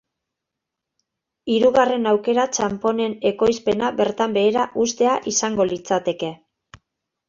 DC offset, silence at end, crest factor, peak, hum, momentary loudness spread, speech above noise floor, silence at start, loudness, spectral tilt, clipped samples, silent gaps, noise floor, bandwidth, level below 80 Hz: under 0.1%; 0.95 s; 18 dB; -2 dBFS; none; 5 LU; 64 dB; 1.45 s; -20 LUFS; -3.5 dB/octave; under 0.1%; none; -83 dBFS; 7.6 kHz; -58 dBFS